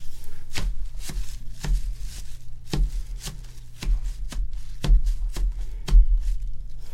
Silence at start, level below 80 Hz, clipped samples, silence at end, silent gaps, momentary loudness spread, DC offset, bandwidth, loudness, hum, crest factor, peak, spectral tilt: 0 s; -24 dBFS; under 0.1%; 0 s; none; 18 LU; under 0.1%; 13 kHz; -30 LUFS; none; 18 dB; -6 dBFS; -5 dB/octave